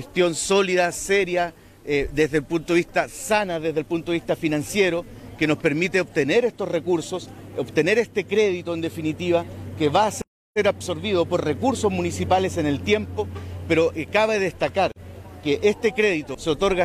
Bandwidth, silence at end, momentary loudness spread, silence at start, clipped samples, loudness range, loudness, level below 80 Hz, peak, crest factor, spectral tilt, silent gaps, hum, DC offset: 15 kHz; 0 s; 9 LU; 0 s; under 0.1%; 1 LU; -23 LUFS; -48 dBFS; -6 dBFS; 16 dB; -4.5 dB/octave; 10.27-10.54 s; none; under 0.1%